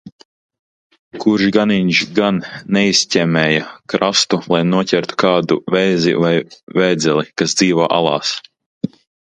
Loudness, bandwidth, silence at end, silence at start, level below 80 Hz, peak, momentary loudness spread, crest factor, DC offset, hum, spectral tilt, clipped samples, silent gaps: -15 LUFS; 9.8 kHz; 0.4 s; 0.05 s; -56 dBFS; 0 dBFS; 8 LU; 16 dB; under 0.1%; none; -4.5 dB/octave; under 0.1%; 0.12-0.19 s, 0.25-0.49 s, 0.59-0.90 s, 0.99-1.11 s, 6.63-6.67 s, 8.66-8.81 s